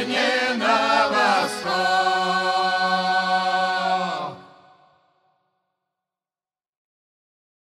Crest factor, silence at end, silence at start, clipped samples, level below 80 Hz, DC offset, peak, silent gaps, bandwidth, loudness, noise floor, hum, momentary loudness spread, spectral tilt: 18 dB; 3.15 s; 0 s; under 0.1%; -70 dBFS; under 0.1%; -6 dBFS; none; 14 kHz; -20 LUFS; under -90 dBFS; none; 5 LU; -3 dB/octave